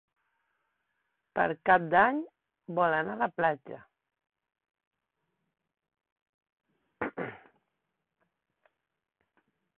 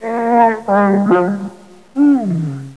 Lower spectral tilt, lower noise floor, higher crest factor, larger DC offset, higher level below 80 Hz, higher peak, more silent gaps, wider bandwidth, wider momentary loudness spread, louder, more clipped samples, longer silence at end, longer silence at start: about the same, -9 dB/octave vs -9 dB/octave; first, -84 dBFS vs -36 dBFS; first, 24 dB vs 14 dB; second, under 0.1% vs 0.3%; second, -70 dBFS vs -64 dBFS; second, -10 dBFS vs -2 dBFS; first, 4.87-4.91 s, 6.12-6.16 s, 6.22-6.41 s, 6.53-6.57 s vs none; second, 4.3 kHz vs 11 kHz; first, 17 LU vs 12 LU; second, -28 LUFS vs -14 LUFS; neither; first, 2.4 s vs 0.05 s; first, 1.35 s vs 0 s